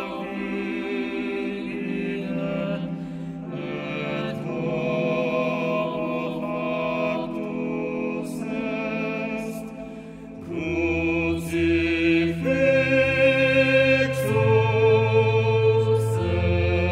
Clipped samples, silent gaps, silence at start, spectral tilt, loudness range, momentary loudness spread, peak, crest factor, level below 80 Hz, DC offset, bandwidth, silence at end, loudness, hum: under 0.1%; none; 0 s; -7 dB/octave; 10 LU; 12 LU; -6 dBFS; 16 dB; -46 dBFS; under 0.1%; 15.5 kHz; 0 s; -23 LUFS; none